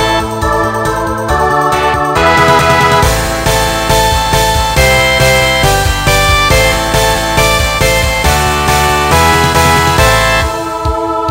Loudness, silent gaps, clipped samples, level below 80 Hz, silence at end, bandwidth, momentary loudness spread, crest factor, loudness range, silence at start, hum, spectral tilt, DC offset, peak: -9 LUFS; none; 0.2%; -20 dBFS; 0 s; 16.5 kHz; 6 LU; 10 dB; 1 LU; 0 s; none; -3.5 dB/octave; under 0.1%; 0 dBFS